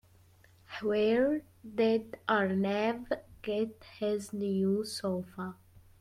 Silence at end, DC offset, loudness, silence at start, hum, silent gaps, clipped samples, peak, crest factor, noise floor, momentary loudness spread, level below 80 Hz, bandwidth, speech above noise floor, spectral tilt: 0.45 s; under 0.1%; -32 LUFS; 0.7 s; none; none; under 0.1%; -14 dBFS; 18 dB; -61 dBFS; 10 LU; -66 dBFS; 15 kHz; 30 dB; -6 dB/octave